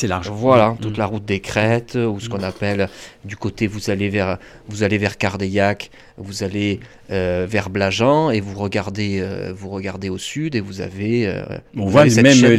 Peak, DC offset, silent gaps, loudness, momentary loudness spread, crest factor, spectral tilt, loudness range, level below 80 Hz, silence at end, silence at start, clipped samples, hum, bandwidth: -2 dBFS; under 0.1%; none; -19 LUFS; 14 LU; 16 dB; -5.5 dB/octave; 3 LU; -48 dBFS; 0 s; 0 s; under 0.1%; none; 14 kHz